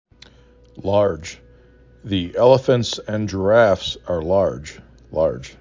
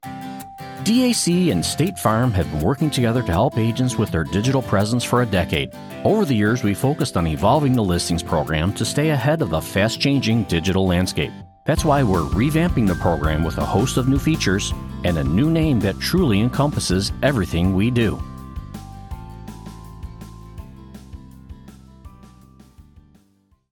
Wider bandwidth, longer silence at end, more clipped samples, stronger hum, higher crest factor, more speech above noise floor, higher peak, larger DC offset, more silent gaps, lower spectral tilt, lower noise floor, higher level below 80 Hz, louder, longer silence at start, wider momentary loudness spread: second, 7.6 kHz vs 18 kHz; second, 0.1 s vs 0.9 s; neither; neither; about the same, 18 dB vs 16 dB; second, 31 dB vs 41 dB; about the same, -2 dBFS vs -4 dBFS; neither; neither; about the same, -6 dB/octave vs -5.5 dB/octave; second, -49 dBFS vs -60 dBFS; second, -42 dBFS vs -36 dBFS; about the same, -19 LUFS vs -20 LUFS; first, 0.75 s vs 0.05 s; second, 15 LU vs 18 LU